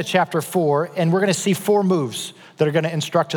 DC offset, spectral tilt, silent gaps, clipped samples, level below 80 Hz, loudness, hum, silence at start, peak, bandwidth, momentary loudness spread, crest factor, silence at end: under 0.1%; -5 dB/octave; none; under 0.1%; -78 dBFS; -20 LUFS; none; 0 s; -4 dBFS; 19.5 kHz; 5 LU; 16 dB; 0 s